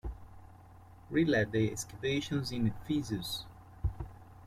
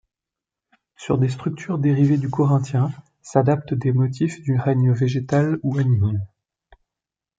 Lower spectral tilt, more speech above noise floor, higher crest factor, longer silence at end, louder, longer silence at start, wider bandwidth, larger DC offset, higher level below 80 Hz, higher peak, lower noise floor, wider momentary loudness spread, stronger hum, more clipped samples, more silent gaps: second, -5.5 dB/octave vs -8.5 dB/octave; second, 22 dB vs 68 dB; about the same, 18 dB vs 18 dB; second, 0 s vs 1.15 s; second, -34 LUFS vs -21 LUFS; second, 0.05 s vs 1 s; first, 16 kHz vs 7.8 kHz; neither; first, -50 dBFS vs -58 dBFS; second, -18 dBFS vs -4 dBFS; second, -55 dBFS vs -88 dBFS; first, 18 LU vs 7 LU; neither; neither; neither